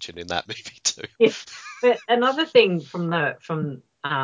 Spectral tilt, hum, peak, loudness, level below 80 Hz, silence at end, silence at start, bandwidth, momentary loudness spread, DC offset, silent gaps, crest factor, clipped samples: -4 dB/octave; none; -4 dBFS; -22 LUFS; -60 dBFS; 0 s; 0 s; 7.8 kHz; 15 LU; under 0.1%; none; 20 dB; under 0.1%